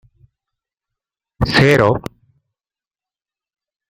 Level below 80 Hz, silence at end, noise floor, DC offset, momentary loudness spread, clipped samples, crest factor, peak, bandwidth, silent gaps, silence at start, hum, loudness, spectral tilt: -40 dBFS; 1.9 s; under -90 dBFS; under 0.1%; 13 LU; under 0.1%; 20 dB; -2 dBFS; 15.5 kHz; none; 1.4 s; none; -14 LUFS; -6 dB/octave